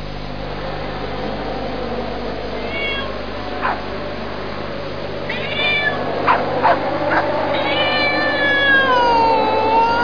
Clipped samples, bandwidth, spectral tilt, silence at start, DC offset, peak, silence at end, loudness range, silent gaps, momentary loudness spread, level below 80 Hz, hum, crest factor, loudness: under 0.1%; 5.4 kHz; -5.5 dB/octave; 0 s; 3%; -2 dBFS; 0 s; 9 LU; none; 13 LU; -38 dBFS; 50 Hz at -35 dBFS; 16 dB; -18 LUFS